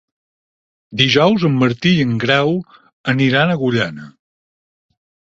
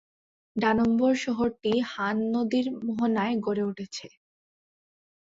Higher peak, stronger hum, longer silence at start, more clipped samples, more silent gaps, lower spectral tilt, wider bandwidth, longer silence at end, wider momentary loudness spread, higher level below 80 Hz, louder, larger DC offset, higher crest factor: first, 0 dBFS vs -10 dBFS; neither; first, 0.9 s vs 0.55 s; neither; first, 2.93-3.04 s vs none; about the same, -6 dB/octave vs -5.5 dB/octave; about the same, 7.8 kHz vs 7.8 kHz; first, 1.3 s vs 1.15 s; about the same, 11 LU vs 10 LU; first, -54 dBFS vs -62 dBFS; first, -15 LUFS vs -27 LUFS; neither; about the same, 18 dB vs 16 dB